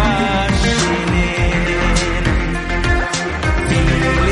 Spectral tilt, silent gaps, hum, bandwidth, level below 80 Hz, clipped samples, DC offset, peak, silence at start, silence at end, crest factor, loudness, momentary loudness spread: -5 dB/octave; none; none; 11.5 kHz; -20 dBFS; under 0.1%; under 0.1%; -2 dBFS; 0 s; 0 s; 14 dB; -16 LUFS; 4 LU